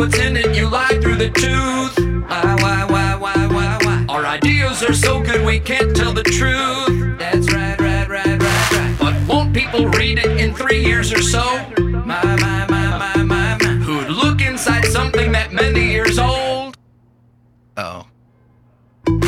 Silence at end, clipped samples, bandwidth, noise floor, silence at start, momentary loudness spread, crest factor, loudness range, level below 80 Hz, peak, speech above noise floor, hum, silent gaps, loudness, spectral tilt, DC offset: 0 s; under 0.1%; 16 kHz; -52 dBFS; 0 s; 5 LU; 14 dB; 2 LU; -24 dBFS; -2 dBFS; 37 dB; none; none; -16 LUFS; -5 dB/octave; under 0.1%